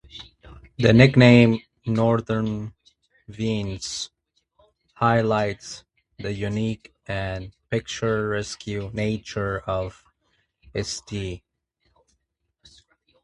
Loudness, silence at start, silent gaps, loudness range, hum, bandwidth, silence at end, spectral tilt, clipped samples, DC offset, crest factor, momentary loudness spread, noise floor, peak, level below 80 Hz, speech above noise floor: -22 LUFS; 0.15 s; none; 12 LU; none; 11 kHz; 1.85 s; -6 dB/octave; under 0.1%; under 0.1%; 24 dB; 20 LU; -75 dBFS; 0 dBFS; -48 dBFS; 53 dB